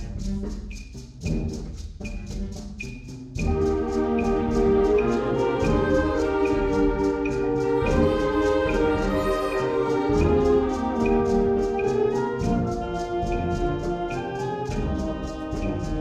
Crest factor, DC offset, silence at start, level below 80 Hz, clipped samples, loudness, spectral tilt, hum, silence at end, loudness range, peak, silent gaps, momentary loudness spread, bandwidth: 14 dB; under 0.1%; 0 s; -34 dBFS; under 0.1%; -24 LUFS; -7 dB/octave; none; 0 s; 6 LU; -8 dBFS; none; 13 LU; 10.5 kHz